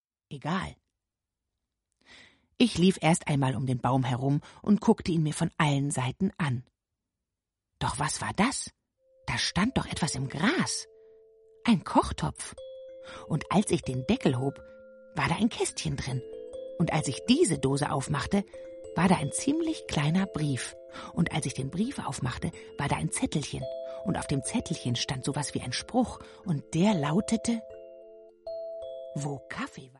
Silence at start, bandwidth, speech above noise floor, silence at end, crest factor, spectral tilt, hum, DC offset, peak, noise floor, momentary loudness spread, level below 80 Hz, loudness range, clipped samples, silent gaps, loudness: 0.3 s; 11.5 kHz; 59 dB; 0.1 s; 22 dB; -5 dB/octave; none; under 0.1%; -8 dBFS; -88 dBFS; 14 LU; -52 dBFS; 4 LU; under 0.1%; none; -29 LUFS